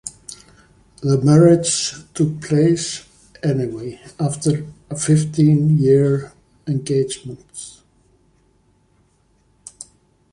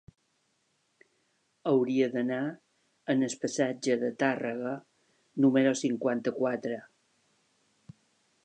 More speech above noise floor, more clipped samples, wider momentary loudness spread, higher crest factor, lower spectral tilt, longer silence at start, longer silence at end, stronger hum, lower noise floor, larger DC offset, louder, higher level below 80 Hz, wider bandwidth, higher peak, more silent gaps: second, 42 dB vs 46 dB; neither; first, 22 LU vs 12 LU; about the same, 18 dB vs 20 dB; about the same, -6 dB/octave vs -5.5 dB/octave; second, 0.05 s vs 1.65 s; second, 0.5 s vs 1.65 s; neither; second, -59 dBFS vs -74 dBFS; neither; first, -17 LUFS vs -29 LUFS; first, -52 dBFS vs -80 dBFS; first, 11.5 kHz vs 9.6 kHz; first, -2 dBFS vs -12 dBFS; neither